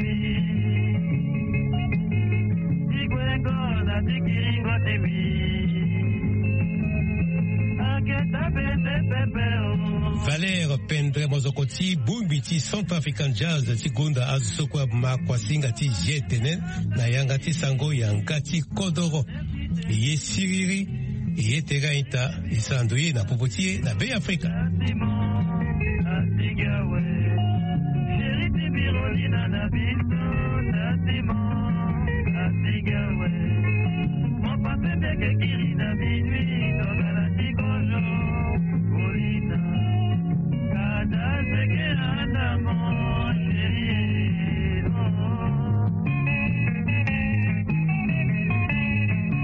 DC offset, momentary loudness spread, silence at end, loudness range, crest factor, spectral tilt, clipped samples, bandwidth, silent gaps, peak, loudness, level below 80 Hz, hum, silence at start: under 0.1%; 2 LU; 0 s; 1 LU; 12 dB; -6 dB/octave; under 0.1%; 8.8 kHz; none; -12 dBFS; -24 LUFS; -38 dBFS; none; 0 s